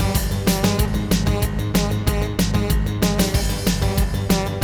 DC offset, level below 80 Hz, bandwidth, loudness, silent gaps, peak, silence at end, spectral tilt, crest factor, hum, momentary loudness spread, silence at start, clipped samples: under 0.1%; -24 dBFS; 20 kHz; -20 LUFS; none; -4 dBFS; 0 s; -5 dB/octave; 14 dB; none; 3 LU; 0 s; under 0.1%